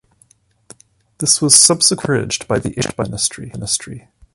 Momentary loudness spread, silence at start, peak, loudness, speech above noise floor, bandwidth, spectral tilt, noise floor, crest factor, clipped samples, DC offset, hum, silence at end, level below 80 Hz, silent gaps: 13 LU; 1.2 s; 0 dBFS; -14 LUFS; 39 dB; 16 kHz; -2.5 dB/octave; -55 dBFS; 18 dB; under 0.1%; under 0.1%; none; 0.35 s; -46 dBFS; none